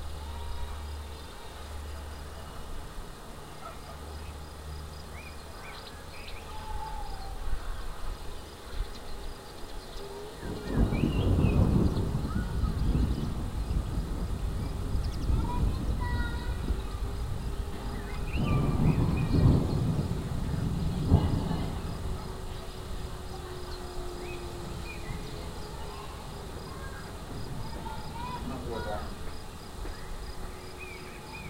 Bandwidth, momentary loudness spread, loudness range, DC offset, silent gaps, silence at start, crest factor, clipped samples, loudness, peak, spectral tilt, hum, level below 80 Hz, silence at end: 16 kHz; 16 LU; 14 LU; 0.2%; none; 0 s; 24 dB; under 0.1%; -34 LUFS; -8 dBFS; -6.5 dB/octave; none; -36 dBFS; 0 s